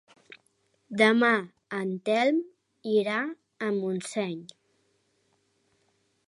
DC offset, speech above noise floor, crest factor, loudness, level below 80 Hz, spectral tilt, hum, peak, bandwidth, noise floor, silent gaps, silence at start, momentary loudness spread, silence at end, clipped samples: under 0.1%; 45 dB; 22 dB; -27 LUFS; -82 dBFS; -5 dB/octave; none; -6 dBFS; 11.5 kHz; -71 dBFS; none; 0.3 s; 15 LU; 1.8 s; under 0.1%